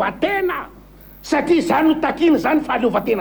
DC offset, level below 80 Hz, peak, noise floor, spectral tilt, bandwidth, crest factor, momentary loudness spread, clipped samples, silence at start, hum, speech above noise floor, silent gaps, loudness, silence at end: under 0.1%; -46 dBFS; -4 dBFS; -42 dBFS; -5.5 dB/octave; over 20 kHz; 14 dB; 10 LU; under 0.1%; 0 s; 50 Hz at -45 dBFS; 25 dB; none; -18 LUFS; 0 s